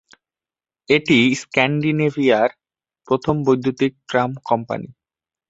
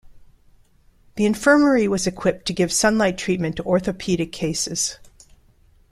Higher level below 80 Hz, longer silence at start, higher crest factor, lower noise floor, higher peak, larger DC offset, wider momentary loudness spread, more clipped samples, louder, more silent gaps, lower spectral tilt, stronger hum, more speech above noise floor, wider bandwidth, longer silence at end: second, -56 dBFS vs -48 dBFS; first, 0.9 s vs 0.15 s; about the same, 18 dB vs 20 dB; first, under -90 dBFS vs -55 dBFS; about the same, -2 dBFS vs -2 dBFS; neither; about the same, 8 LU vs 8 LU; neither; about the same, -19 LUFS vs -20 LUFS; neither; first, -6 dB/octave vs -4 dB/octave; neither; first, over 72 dB vs 35 dB; second, 8 kHz vs 15 kHz; second, 0.6 s vs 0.95 s